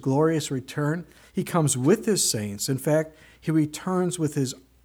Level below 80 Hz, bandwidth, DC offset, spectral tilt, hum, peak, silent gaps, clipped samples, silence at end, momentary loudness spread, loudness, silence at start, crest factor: -60 dBFS; 19.5 kHz; under 0.1%; -5 dB/octave; none; -8 dBFS; none; under 0.1%; 0.25 s; 10 LU; -25 LUFS; 0 s; 18 dB